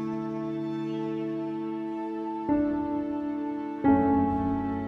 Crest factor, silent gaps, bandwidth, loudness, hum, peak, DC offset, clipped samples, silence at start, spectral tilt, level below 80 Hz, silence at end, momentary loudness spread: 18 dB; none; 5.6 kHz; -29 LUFS; none; -10 dBFS; under 0.1%; under 0.1%; 0 s; -9.5 dB/octave; -52 dBFS; 0 s; 9 LU